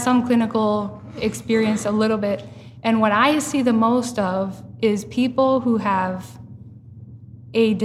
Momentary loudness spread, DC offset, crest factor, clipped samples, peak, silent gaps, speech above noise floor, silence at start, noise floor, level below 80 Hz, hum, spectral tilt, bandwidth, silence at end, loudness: 12 LU; under 0.1%; 18 dB; under 0.1%; -4 dBFS; none; 21 dB; 0 s; -41 dBFS; -56 dBFS; none; -5.5 dB/octave; 14 kHz; 0 s; -20 LUFS